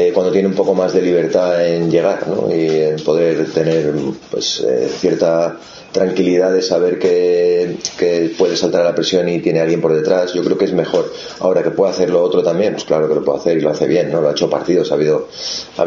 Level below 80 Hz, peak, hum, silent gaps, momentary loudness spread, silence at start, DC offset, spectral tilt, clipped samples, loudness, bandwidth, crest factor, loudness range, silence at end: -54 dBFS; 0 dBFS; none; none; 5 LU; 0 s; under 0.1%; -5.5 dB/octave; under 0.1%; -15 LUFS; 7.4 kHz; 14 dB; 1 LU; 0 s